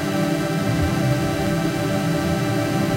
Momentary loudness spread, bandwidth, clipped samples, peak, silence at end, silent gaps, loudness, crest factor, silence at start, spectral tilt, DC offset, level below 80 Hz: 1 LU; 16 kHz; under 0.1%; -8 dBFS; 0 s; none; -21 LUFS; 12 dB; 0 s; -6 dB/octave; under 0.1%; -38 dBFS